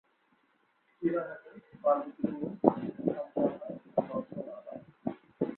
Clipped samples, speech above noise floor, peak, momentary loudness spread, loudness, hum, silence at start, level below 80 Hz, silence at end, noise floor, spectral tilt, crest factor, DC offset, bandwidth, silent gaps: under 0.1%; 40 dB; -4 dBFS; 14 LU; -34 LUFS; none; 1 s; -72 dBFS; 0 s; -72 dBFS; -11.5 dB/octave; 30 dB; under 0.1%; 4.2 kHz; none